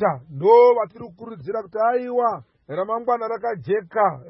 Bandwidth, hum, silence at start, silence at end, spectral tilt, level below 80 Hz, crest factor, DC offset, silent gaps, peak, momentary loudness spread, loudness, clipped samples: 5.8 kHz; none; 0 s; 0.05 s; -11 dB/octave; -66 dBFS; 16 dB; under 0.1%; none; -4 dBFS; 19 LU; -20 LUFS; under 0.1%